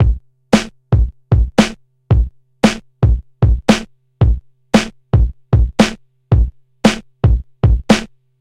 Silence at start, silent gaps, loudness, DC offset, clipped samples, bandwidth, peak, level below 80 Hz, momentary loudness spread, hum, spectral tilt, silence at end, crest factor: 0 s; none; -16 LUFS; under 0.1%; under 0.1%; 12 kHz; 0 dBFS; -20 dBFS; 3 LU; none; -6 dB/octave; 0.35 s; 14 dB